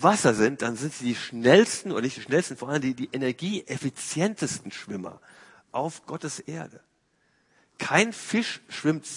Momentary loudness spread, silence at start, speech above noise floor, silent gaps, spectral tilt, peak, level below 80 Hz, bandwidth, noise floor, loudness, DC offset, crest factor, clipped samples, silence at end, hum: 15 LU; 0 s; 43 dB; none; -4.5 dB/octave; -2 dBFS; -68 dBFS; 11 kHz; -69 dBFS; -26 LUFS; under 0.1%; 24 dB; under 0.1%; 0 s; none